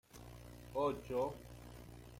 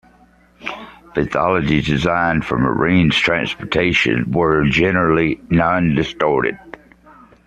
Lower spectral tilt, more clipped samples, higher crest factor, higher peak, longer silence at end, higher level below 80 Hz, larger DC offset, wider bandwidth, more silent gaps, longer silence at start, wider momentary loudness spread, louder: about the same, -6.5 dB/octave vs -6.5 dB/octave; neither; about the same, 18 dB vs 16 dB; second, -26 dBFS vs -2 dBFS; second, 0 s vs 0.75 s; second, -60 dBFS vs -40 dBFS; neither; first, 16.5 kHz vs 9.2 kHz; neither; second, 0.1 s vs 0.6 s; first, 17 LU vs 10 LU; second, -40 LUFS vs -16 LUFS